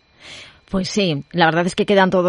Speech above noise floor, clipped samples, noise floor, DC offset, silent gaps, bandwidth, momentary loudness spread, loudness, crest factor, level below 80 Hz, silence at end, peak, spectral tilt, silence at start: 24 dB; under 0.1%; -40 dBFS; under 0.1%; none; 10.5 kHz; 22 LU; -18 LUFS; 18 dB; -46 dBFS; 0 s; 0 dBFS; -5 dB/octave; 0.25 s